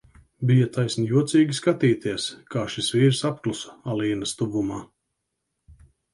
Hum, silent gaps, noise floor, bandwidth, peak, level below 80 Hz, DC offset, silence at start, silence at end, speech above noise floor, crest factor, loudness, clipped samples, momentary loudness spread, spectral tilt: none; none; -79 dBFS; 11.5 kHz; -6 dBFS; -58 dBFS; under 0.1%; 0.4 s; 0.4 s; 56 dB; 18 dB; -24 LUFS; under 0.1%; 10 LU; -6 dB/octave